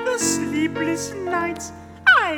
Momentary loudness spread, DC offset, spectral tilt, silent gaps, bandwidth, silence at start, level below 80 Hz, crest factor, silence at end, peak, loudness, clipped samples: 13 LU; under 0.1%; -2.5 dB/octave; none; 18.5 kHz; 0 s; -54 dBFS; 18 dB; 0 s; -4 dBFS; -21 LUFS; under 0.1%